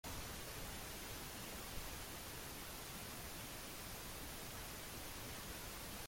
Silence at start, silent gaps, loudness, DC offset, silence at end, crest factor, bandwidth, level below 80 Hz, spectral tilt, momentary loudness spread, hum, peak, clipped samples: 0.05 s; none; -49 LUFS; under 0.1%; 0 s; 16 dB; 16.5 kHz; -58 dBFS; -2.5 dB/octave; 1 LU; none; -34 dBFS; under 0.1%